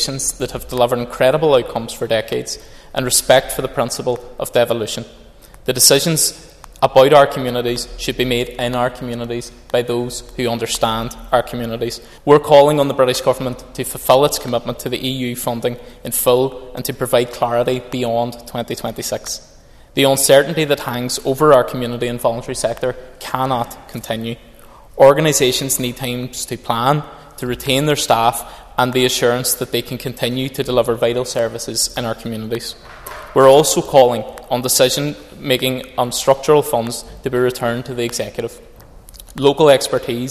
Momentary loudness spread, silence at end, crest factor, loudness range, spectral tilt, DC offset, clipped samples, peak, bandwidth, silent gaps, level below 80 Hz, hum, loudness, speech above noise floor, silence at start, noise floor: 14 LU; 0 s; 16 dB; 5 LU; -3.5 dB/octave; under 0.1%; under 0.1%; 0 dBFS; 14.5 kHz; none; -42 dBFS; none; -16 LUFS; 23 dB; 0 s; -40 dBFS